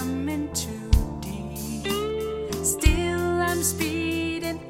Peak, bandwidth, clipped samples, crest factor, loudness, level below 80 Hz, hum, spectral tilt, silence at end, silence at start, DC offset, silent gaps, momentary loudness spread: -4 dBFS; 16.5 kHz; under 0.1%; 20 dB; -26 LUFS; -30 dBFS; none; -4.5 dB/octave; 0 s; 0 s; under 0.1%; none; 9 LU